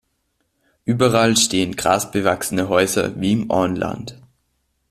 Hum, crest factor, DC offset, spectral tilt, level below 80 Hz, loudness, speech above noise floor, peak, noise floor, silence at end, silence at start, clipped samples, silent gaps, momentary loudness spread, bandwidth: none; 18 dB; under 0.1%; -4 dB/octave; -52 dBFS; -18 LUFS; 51 dB; -2 dBFS; -69 dBFS; 0.75 s; 0.85 s; under 0.1%; none; 11 LU; 15.5 kHz